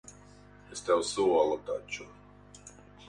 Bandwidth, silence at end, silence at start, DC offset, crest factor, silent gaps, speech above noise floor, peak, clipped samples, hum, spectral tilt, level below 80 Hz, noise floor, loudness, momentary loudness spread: 11.5 kHz; 0.05 s; 0.05 s; under 0.1%; 18 dB; none; 25 dB; -14 dBFS; under 0.1%; 50 Hz at -55 dBFS; -3.5 dB/octave; -62 dBFS; -54 dBFS; -30 LUFS; 25 LU